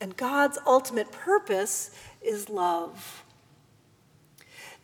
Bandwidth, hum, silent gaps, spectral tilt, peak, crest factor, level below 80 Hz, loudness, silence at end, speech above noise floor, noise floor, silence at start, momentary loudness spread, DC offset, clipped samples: over 20 kHz; none; none; -3 dB/octave; -8 dBFS; 20 dB; -74 dBFS; -27 LUFS; 0.1 s; 34 dB; -61 dBFS; 0 s; 20 LU; under 0.1%; under 0.1%